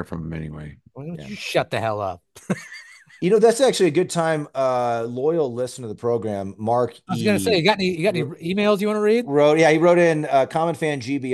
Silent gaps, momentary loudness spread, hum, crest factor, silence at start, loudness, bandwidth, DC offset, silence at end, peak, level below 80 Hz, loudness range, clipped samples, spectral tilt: none; 16 LU; none; 18 dB; 0 s; -20 LUFS; 12.5 kHz; under 0.1%; 0 s; -2 dBFS; -56 dBFS; 5 LU; under 0.1%; -5.5 dB/octave